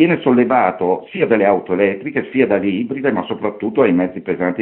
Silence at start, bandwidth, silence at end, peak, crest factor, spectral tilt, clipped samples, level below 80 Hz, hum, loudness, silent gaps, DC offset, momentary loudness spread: 0 s; 4.1 kHz; 0 s; 0 dBFS; 16 dB; -11 dB/octave; under 0.1%; -58 dBFS; none; -17 LUFS; none; under 0.1%; 7 LU